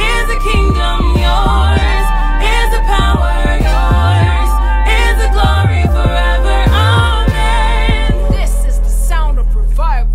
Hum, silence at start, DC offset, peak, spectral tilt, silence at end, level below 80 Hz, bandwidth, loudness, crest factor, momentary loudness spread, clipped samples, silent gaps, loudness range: none; 0 s; under 0.1%; 0 dBFS; -5.5 dB/octave; 0 s; -12 dBFS; 14 kHz; -13 LUFS; 8 dB; 5 LU; under 0.1%; none; 1 LU